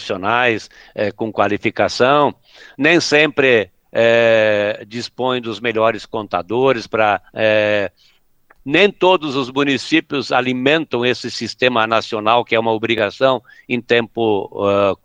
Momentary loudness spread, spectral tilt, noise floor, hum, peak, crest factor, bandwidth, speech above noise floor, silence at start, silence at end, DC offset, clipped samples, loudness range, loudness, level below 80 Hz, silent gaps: 10 LU; -4.5 dB/octave; -53 dBFS; none; 0 dBFS; 16 dB; 9.4 kHz; 36 dB; 0 s; 0.1 s; under 0.1%; under 0.1%; 3 LU; -16 LUFS; -58 dBFS; none